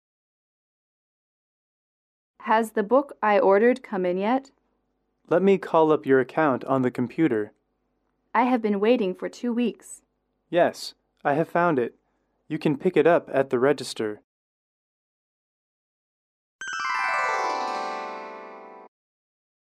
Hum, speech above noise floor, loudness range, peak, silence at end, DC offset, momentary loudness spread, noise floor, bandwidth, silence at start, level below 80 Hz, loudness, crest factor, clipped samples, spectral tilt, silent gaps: none; 51 dB; 7 LU; -8 dBFS; 0.9 s; under 0.1%; 16 LU; -74 dBFS; 14 kHz; 2.4 s; -74 dBFS; -24 LUFS; 18 dB; under 0.1%; -6 dB/octave; 14.24-16.59 s